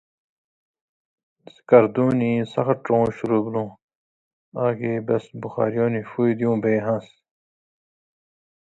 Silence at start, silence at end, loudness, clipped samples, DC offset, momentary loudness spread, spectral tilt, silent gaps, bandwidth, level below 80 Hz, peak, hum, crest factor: 1.7 s; 1.6 s; -22 LUFS; under 0.1%; under 0.1%; 11 LU; -9 dB/octave; 3.82-3.89 s, 3.95-4.52 s; 7.8 kHz; -60 dBFS; 0 dBFS; none; 22 dB